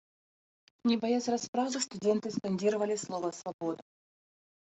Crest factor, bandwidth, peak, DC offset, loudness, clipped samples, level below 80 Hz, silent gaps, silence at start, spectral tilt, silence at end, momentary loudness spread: 16 dB; 8.2 kHz; -16 dBFS; under 0.1%; -32 LUFS; under 0.1%; -78 dBFS; 1.48-1.53 s, 3.54-3.59 s; 0.85 s; -4.5 dB/octave; 0.9 s; 8 LU